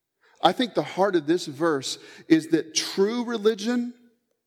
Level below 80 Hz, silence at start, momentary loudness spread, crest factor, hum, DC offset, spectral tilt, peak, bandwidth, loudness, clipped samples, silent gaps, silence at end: -82 dBFS; 0.45 s; 6 LU; 24 dB; none; under 0.1%; -4 dB/octave; -2 dBFS; 15.5 kHz; -24 LUFS; under 0.1%; none; 0.55 s